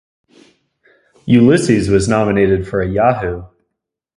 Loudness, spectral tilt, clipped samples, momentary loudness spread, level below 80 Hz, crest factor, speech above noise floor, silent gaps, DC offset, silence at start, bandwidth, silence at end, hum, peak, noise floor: -14 LUFS; -6.5 dB/octave; under 0.1%; 12 LU; -36 dBFS; 16 dB; 64 dB; none; under 0.1%; 1.25 s; 11.5 kHz; 0.7 s; none; 0 dBFS; -77 dBFS